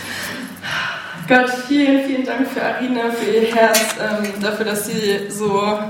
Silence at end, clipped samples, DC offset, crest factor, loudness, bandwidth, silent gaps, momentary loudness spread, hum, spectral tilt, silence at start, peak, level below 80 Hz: 0 s; under 0.1%; under 0.1%; 18 dB; -18 LUFS; 16.5 kHz; none; 10 LU; none; -3.5 dB/octave; 0 s; 0 dBFS; -60 dBFS